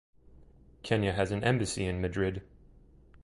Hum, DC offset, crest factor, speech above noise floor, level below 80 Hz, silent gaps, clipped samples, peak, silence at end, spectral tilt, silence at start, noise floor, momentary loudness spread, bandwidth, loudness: none; under 0.1%; 22 dB; 27 dB; -48 dBFS; none; under 0.1%; -10 dBFS; 0.05 s; -5.5 dB/octave; 0.4 s; -57 dBFS; 8 LU; 11.5 kHz; -31 LUFS